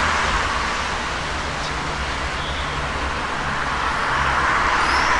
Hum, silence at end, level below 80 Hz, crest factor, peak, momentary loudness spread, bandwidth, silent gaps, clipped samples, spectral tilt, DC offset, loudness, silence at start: none; 0 s; -32 dBFS; 16 dB; -6 dBFS; 7 LU; 11.5 kHz; none; under 0.1%; -3 dB/octave; 0.6%; -21 LUFS; 0 s